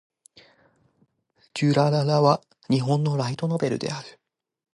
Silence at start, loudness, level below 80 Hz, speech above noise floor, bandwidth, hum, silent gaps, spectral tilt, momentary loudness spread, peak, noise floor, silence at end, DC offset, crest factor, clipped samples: 1.55 s; -23 LUFS; -68 dBFS; 45 dB; 11.5 kHz; none; none; -7 dB/octave; 13 LU; -6 dBFS; -67 dBFS; 0.65 s; under 0.1%; 20 dB; under 0.1%